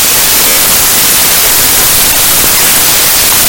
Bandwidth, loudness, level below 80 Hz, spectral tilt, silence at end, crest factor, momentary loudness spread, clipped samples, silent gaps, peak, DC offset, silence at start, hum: over 20 kHz; -3 LUFS; -30 dBFS; 0 dB/octave; 0 s; 6 dB; 0 LU; 4%; none; 0 dBFS; under 0.1%; 0 s; none